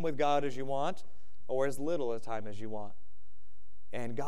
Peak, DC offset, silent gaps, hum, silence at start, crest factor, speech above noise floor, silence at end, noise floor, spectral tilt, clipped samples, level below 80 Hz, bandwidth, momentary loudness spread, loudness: -16 dBFS; 3%; none; none; 0 s; 18 dB; 32 dB; 0 s; -67 dBFS; -6 dB/octave; under 0.1%; -68 dBFS; 14.5 kHz; 14 LU; -36 LUFS